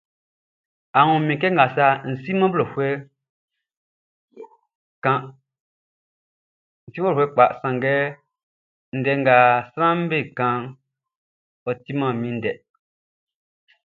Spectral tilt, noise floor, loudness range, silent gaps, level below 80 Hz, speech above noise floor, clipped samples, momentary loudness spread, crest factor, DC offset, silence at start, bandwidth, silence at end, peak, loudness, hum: -9 dB/octave; under -90 dBFS; 11 LU; 3.29-3.48 s, 3.77-4.28 s, 4.75-5.02 s, 5.60-6.87 s, 8.43-8.92 s, 11.15-11.66 s; -66 dBFS; over 70 dB; under 0.1%; 13 LU; 22 dB; under 0.1%; 0.95 s; 4.6 kHz; 1.3 s; 0 dBFS; -20 LUFS; none